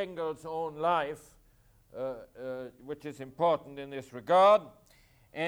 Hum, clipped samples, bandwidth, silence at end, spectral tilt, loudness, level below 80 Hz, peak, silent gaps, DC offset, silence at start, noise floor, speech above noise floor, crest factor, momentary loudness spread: none; under 0.1%; 19 kHz; 0 s; -5.5 dB/octave; -29 LUFS; -68 dBFS; -12 dBFS; none; under 0.1%; 0 s; -63 dBFS; 33 dB; 18 dB; 19 LU